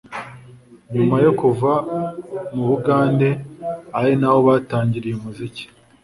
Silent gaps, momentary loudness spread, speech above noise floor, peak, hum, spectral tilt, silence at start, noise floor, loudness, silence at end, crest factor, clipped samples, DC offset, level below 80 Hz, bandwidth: none; 16 LU; 27 dB; -2 dBFS; none; -8.5 dB/octave; 0.1 s; -44 dBFS; -19 LUFS; 0.4 s; 16 dB; under 0.1%; under 0.1%; -54 dBFS; 11.5 kHz